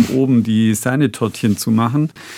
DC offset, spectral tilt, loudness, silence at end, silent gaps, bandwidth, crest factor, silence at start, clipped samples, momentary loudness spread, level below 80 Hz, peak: under 0.1%; -6 dB/octave; -16 LUFS; 0 s; none; 16 kHz; 14 dB; 0 s; under 0.1%; 4 LU; -58 dBFS; -2 dBFS